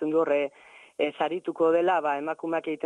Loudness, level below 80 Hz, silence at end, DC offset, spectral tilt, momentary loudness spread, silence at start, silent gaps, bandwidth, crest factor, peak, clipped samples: -27 LUFS; -74 dBFS; 0.1 s; under 0.1%; -6 dB/octave; 7 LU; 0 s; none; 9.6 kHz; 14 dB; -12 dBFS; under 0.1%